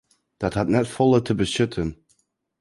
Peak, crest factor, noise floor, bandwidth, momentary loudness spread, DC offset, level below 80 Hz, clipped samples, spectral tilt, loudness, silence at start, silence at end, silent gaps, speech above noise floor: -6 dBFS; 16 dB; -68 dBFS; 11.5 kHz; 10 LU; under 0.1%; -46 dBFS; under 0.1%; -6 dB/octave; -22 LUFS; 0.4 s; 0.65 s; none; 46 dB